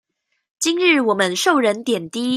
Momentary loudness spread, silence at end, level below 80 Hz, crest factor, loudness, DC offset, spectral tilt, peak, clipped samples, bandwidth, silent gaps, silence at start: 7 LU; 0 s; -70 dBFS; 16 dB; -18 LUFS; under 0.1%; -3 dB/octave; -2 dBFS; under 0.1%; 15.5 kHz; none; 0.6 s